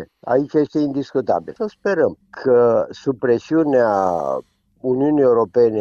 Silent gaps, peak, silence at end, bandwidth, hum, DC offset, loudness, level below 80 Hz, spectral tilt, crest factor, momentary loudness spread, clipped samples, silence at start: none; -4 dBFS; 0 s; 7.2 kHz; none; under 0.1%; -18 LUFS; -58 dBFS; -8 dB/octave; 14 dB; 9 LU; under 0.1%; 0 s